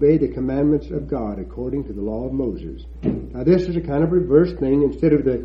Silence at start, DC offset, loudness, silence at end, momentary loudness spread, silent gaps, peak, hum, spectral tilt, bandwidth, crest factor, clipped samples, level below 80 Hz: 0 s; under 0.1%; -21 LUFS; 0 s; 10 LU; none; -2 dBFS; none; -10.5 dB/octave; 6.6 kHz; 18 dB; under 0.1%; -36 dBFS